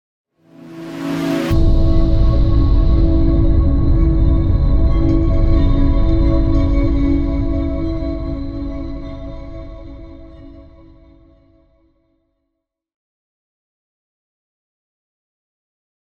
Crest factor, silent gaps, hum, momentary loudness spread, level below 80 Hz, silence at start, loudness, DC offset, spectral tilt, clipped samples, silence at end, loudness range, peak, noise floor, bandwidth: 12 dB; none; none; 18 LU; -18 dBFS; 0.65 s; -17 LUFS; under 0.1%; -9 dB/octave; under 0.1%; 5.4 s; 16 LU; -4 dBFS; -76 dBFS; 6.8 kHz